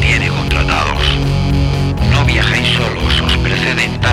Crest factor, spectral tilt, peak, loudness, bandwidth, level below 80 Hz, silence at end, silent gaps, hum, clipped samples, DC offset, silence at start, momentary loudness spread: 12 dB; -5 dB/octave; 0 dBFS; -13 LUFS; 14 kHz; -20 dBFS; 0 s; none; none; under 0.1%; under 0.1%; 0 s; 3 LU